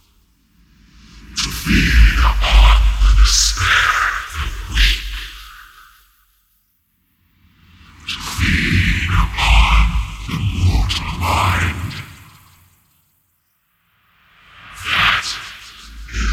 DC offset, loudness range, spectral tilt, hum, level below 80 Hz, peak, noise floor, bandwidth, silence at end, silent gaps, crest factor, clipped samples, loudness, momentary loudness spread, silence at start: under 0.1%; 11 LU; -3 dB/octave; none; -20 dBFS; 0 dBFS; -64 dBFS; 15.5 kHz; 0 s; none; 16 dB; under 0.1%; -16 LUFS; 18 LU; 1.15 s